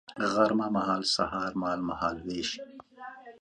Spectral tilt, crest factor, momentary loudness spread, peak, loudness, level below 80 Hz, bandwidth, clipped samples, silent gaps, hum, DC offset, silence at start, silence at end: -4 dB/octave; 20 dB; 20 LU; -10 dBFS; -29 LUFS; -60 dBFS; 10.5 kHz; under 0.1%; none; none; under 0.1%; 0.1 s; 0.05 s